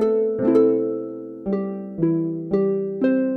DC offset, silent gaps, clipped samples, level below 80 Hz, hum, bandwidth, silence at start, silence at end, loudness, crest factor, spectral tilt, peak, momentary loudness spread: under 0.1%; none; under 0.1%; -58 dBFS; none; 4.6 kHz; 0 s; 0 s; -22 LUFS; 16 dB; -10.5 dB/octave; -4 dBFS; 12 LU